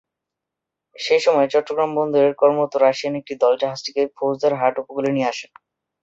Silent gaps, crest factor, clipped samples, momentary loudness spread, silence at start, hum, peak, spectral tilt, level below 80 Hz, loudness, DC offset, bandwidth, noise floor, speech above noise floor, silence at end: none; 18 dB; under 0.1%; 8 LU; 1 s; none; -2 dBFS; -5 dB/octave; -70 dBFS; -19 LUFS; under 0.1%; 8 kHz; -84 dBFS; 65 dB; 0.55 s